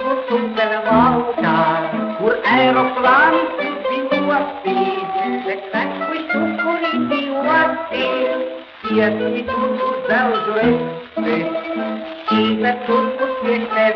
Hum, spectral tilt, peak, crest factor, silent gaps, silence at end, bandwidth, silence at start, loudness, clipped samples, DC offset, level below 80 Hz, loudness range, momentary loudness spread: none; -7.5 dB/octave; -2 dBFS; 14 dB; none; 0 s; 6.2 kHz; 0 s; -18 LUFS; under 0.1%; under 0.1%; -54 dBFS; 4 LU; 8 LU